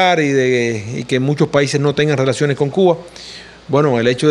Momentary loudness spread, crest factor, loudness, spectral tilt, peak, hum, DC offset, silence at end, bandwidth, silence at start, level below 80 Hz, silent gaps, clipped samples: 10 LU; 14 dB; -15 LUFS; -5.5 dB/octave; 0 dBFS; none; under 0.1%; 0 s; 11.5 kHz; 0 s; -52 dBFS; none; under 0.1%